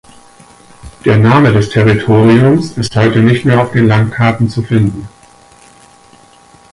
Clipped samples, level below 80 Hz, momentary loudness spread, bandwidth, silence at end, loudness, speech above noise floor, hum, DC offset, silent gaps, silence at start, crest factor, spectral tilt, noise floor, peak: under 0.1%; -38 dBFS; 8 LU; 11.5 kHz; 1.65 s; -10 LUFS; 33 dB; none; under 0.1%; none; 0.85 s; 12 dB; -7.5 dB/octave; -42 dBFS; 0 dBFS